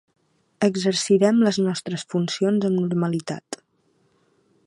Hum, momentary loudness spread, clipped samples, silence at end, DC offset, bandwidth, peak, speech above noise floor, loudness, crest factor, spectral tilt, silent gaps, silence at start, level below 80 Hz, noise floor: none; 14 LU; under 0.1%; 1.1 s; under 0.1%; 11.5 kHz; -6 dBFS; 44 dB; -22 LUFS; 18 dB; -5.5 dB/octave; none; 0.6 s; -70 dBFS; -65 dBFS